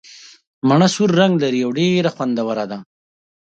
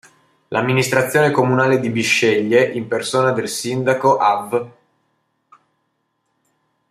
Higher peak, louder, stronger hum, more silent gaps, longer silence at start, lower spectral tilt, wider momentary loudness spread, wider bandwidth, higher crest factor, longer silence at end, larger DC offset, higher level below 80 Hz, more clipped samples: about the same, 0 dBFS vs -2 dBFS; about the same, -17 LUFS vs -17 LUFS; neither; first, 0.47-0.62 s vs none; second, 0.15 s vs 0.5 s; about the same, -6 dB/octave vs -5 dB/octave; about the same, 9 LU vs 7 LU; second, 9 kHz vs 15.5 kHz; about the same, 18 dB vs 18 dB; second, 0.6 s vs 2.2 s; neither; about the same, -62 dBFS vs -62 dBFS; neither